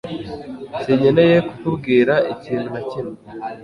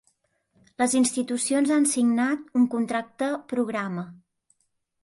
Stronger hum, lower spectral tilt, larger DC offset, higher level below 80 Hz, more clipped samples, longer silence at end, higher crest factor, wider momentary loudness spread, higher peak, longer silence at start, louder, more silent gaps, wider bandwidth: neither; first, -8 dB/octave vs -4 dB/octave; neither; first, -52 dBFS vs -70 dBFS; neither; second, 0 s vs 0.9 s; about the same, 16 dB vs 14 dB; first, 18 LU vs 8 LU; first, -2 dBFS vs -12 dBFS; second, 0.05 s vs 0.8 s; first, -18 LUFS vs -24 LUFS; neither; about the same, 10.5 kHz vs 11.5 kHz